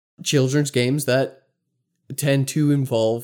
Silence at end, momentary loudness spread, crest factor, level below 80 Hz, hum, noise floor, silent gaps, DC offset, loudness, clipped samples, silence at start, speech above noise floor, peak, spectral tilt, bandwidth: 0 s; 5 LU; 14 dB; -72 dBFS; none; -74 dBFS; none; under 0.1%; -21 LUFS; under 0.1%; 0.2 s; 55 dB; -6 dBFS; -5.5 dB/octave; 18 kHz